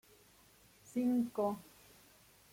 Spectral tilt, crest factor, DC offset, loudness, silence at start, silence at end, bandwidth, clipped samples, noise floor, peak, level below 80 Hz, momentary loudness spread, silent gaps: -6.5 dB/octave; 16 dB; under 0.1%; -37 LUFS; 0.9 s; 0.9 s; 16.5 kHz; under 0.1%; -65 dBFS; -24 dBFS; -76 dBFS; 24 LU; none